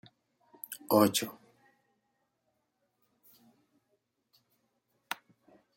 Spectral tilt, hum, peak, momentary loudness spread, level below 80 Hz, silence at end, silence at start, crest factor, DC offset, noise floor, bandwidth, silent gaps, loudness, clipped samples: -4 dB/octave; 60 Hz at -80 dBFS; -12 dBFS; 19 LU; -78 dBFS; 0.6 s; 0.7 s; 26 dB; under 0.1%; -80 dBFS; 16.5 kHz; none; -30 LUFS; under 0.1%